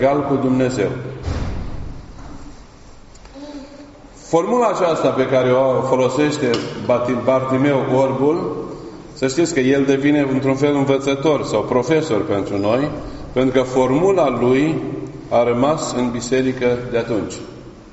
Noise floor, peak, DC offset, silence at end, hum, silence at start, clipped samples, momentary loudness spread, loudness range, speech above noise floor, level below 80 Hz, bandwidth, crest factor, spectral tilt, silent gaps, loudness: -40 dBFS; -2 dBFS; under 0.1%; 0 s; none; 0 s; under 0.1%; 17 LU; 7 LU; 24 dB; -40 dBFS; 8 kHz; 16 dB; -5.5 dB/octave; none; -18 LUFS